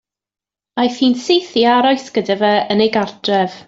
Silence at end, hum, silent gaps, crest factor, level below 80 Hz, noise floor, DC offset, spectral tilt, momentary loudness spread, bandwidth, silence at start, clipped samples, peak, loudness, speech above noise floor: 0.1 s; none; none; 14 dB; -60 dBFS; -89 dBFS; under 0.1%; -5 dB/octave; 6 LU; 7.8 kHz; 0.75 s; under 0.1%; -2 dBFS; -15 LUFS; 74 dB